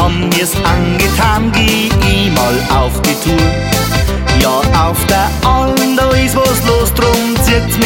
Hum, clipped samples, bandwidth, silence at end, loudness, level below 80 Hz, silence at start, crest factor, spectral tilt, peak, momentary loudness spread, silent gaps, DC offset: none; under 0.1%; 17 kHz; 0 s; -11 LUFS; -18 dBFS; 0 s; 10 dB; -4.5 dB/octave; 0 dBFS; 2 LU; none; under 0.1%